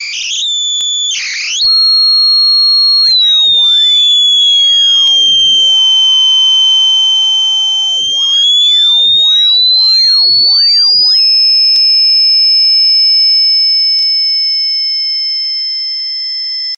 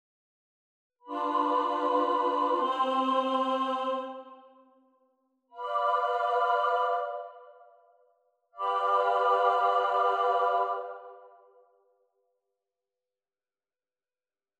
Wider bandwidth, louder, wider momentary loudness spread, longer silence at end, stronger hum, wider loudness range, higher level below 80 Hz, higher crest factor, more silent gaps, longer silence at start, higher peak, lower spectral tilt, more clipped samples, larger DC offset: about the same, 9.6 kHz vs 9.6 kHz; first, -6 LUFS vs -28 LUFS; second, 7 LU vs 12 LU; second, 0 s vs 3.3 s; neither; about the same, 2 LU vs 4 LU; first, -58 dBFS vs -82 dBFS; second, 6 dB vs 18 dB; neither; second, 0 s vs 1.05 s; first, -2 dBFS vs -12 dBFS; second, 3.5 dB/octave vs -3 dB/octave; neither; neither